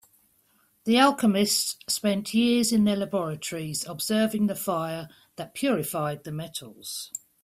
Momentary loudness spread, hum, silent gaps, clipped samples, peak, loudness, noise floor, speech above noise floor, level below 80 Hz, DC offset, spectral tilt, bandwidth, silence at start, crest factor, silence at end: 15 LU; none; none; under 0.1%; -8 dBFS; -25 LUFS; -66 dBFS; 40 dB; -66 dBFS; under 0.1%; -4 dB/octave; 16 kHz; 0.85 s; 20 dB; 0.25 s